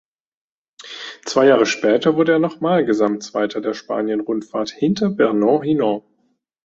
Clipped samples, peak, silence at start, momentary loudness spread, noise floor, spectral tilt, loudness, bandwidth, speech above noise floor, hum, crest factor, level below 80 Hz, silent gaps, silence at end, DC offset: under 0.1%; -2 dBFS; 0.8 s; 10 LU; -66 dBFS; -5.5 dB/octave; -18 LUFS; 7.8 kHz; 49 dB; none; 18 dB; -62 dBFS; none; 0.65 s; under 0.1%